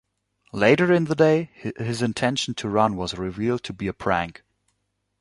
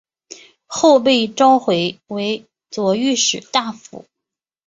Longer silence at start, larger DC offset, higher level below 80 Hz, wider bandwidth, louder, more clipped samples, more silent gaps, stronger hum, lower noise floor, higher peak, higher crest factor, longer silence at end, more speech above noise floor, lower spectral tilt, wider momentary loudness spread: second, 0.55 s vs 0.7 s; neither; first, -52 dBFS vs -64 dBFS; first, 11.5 kHz vs 8 kHz; second, -23 LUFS vs -16 LUFS; neither; neither; first, 50 Hz at -50 dBFS vs none; second, -75 dBFS vs -84 dBFS; about the same, -2 dBFS vs -2 dBFS; first, 22 dB vs 16 dB; first, 0.9 s vs 0.7 s; second, 52 dB vs 68 dB; first, -5.5 dB/octave vs -3 dB/octave; second, 12 LU vs 15 LU